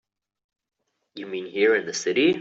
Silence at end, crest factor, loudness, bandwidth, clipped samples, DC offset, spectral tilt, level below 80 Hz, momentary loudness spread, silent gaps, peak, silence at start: 0 s; 16 dB; -23 LUFS; 8 kHz; under 0.1%; under 0.1%; -3.5 dB/octave; -72 dBFS; 13 LU; none; -8 dBFS; 1.15 s